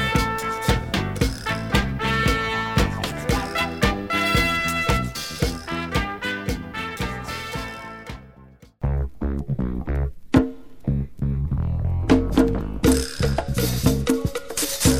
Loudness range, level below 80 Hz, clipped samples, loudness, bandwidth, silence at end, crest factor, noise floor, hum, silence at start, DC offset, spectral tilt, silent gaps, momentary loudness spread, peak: 7 LU; -30 dBFS; under 0.1%; -23 LUFS; 17.5 kHz; 0 s; 20 dB; -48 dBFS; none; 0 s; under 0.1%; -5 dB/octave; none; 9 LU; -2 dBFS